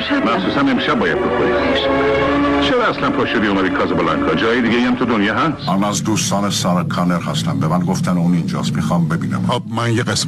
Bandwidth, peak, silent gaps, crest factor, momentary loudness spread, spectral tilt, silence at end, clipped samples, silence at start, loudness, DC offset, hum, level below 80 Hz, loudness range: 14 kHz; -6 dBFS; none; 10 dB; 4 LU; -5 dB/octave; 0 s; under 0.1%; 0 s; -16 LUFS; under 0.1%; none; -40 dBFS; 2 LU